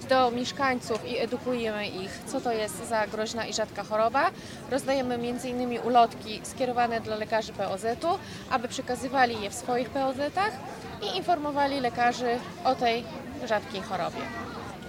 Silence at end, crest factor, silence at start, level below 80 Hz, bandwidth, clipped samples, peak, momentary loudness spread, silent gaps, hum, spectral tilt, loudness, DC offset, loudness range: 0 s; 20 dB; 0 s; -58 dBFS; 16 kHz; under 0.1%; -8 dBFS; 9 LU; none; none; -4 dB/octave; -29 LUFS; under 0.1%; 2 LU